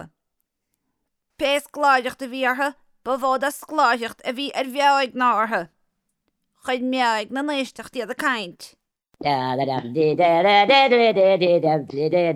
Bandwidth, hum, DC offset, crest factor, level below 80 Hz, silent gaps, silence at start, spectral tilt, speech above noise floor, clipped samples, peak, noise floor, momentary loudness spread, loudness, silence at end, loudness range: 15.5 kHz; none; under 0.1%; 18 dB; -66 dBFS; none; 0 s; -4.5 dB/octave; 57 dB; under 0.1%; -4 dBFS; -77 dBFS; 12 LU; -20 LUFS; 0 s; 7 LU